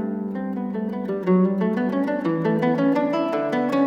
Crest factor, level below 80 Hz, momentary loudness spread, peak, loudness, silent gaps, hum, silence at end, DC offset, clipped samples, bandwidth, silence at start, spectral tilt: 14 dB; -64 dBFS; 8 LU; -8 dBFS; -23 LUFS; none; none; 0 s; under 0.1%; under 0.1%; 7.2 kHz; 0 s; -9 dB/octave